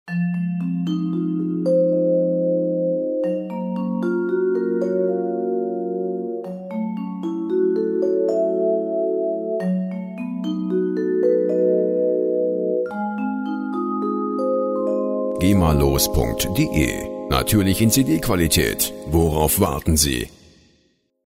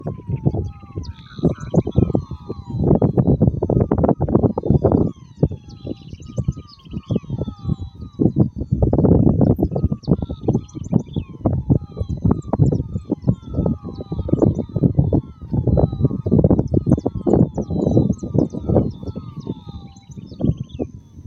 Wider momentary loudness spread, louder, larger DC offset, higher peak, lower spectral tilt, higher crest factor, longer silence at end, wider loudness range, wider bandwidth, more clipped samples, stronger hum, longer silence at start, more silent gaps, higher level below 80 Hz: second, 8 LU vs 15 LU; about the same, -21 LUFS vs -20 LUFS; neither; second, -4 dBFS vs 0 dBFS; second, -5.5 dB/octave vs -10.5 dB/octave; about the same, 18 dB vs 18 dB; first, 0.95 s vs 0.05 s; about the same, 4 LU vs 4 LU; first, 16 kHz vs 7.6 kHz; neither; neither; about the same, 0.05 s vs 0 s; neither; about the same, -36 dBFS vs -32 dBFS